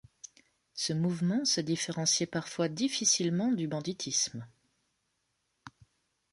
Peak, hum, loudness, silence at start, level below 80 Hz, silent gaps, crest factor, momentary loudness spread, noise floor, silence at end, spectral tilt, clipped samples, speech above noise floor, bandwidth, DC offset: -14 dBFS; none; -30 LUFS; 0.25 s; -72 dBFS; none; 20 dB; 17 LU; -79 dBFS; 0.65 s; -3.5 dB/octave; under 0.1%; 48 dB; 11.5 kHz; under 0.1%